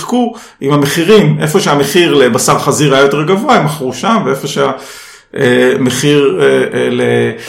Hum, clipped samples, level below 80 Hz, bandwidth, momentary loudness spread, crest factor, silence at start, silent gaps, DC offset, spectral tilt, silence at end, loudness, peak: none; 0.6%; -48 dBFS; 16.5 kHz; 8 LU; 10 dB; 0 s; none; under 0.1%; -5 dB/octave; 0 s; -10 LUFS; 0 dBFS